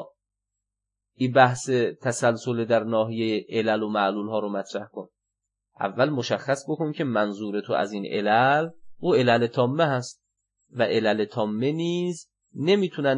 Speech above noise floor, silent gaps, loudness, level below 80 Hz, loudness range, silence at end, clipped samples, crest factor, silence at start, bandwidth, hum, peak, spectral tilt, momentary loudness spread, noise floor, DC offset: 62 dB; none; -24 LUFS; -74 dBFS; 4 LU; 0 s; under 0.1%; 20 dB; 0 s; 11 kHz; 50 Hz at -60 dBFS; -4 dBFS; -5.5 dB/octave; 11 LU; -86 dBFS; under 0.1%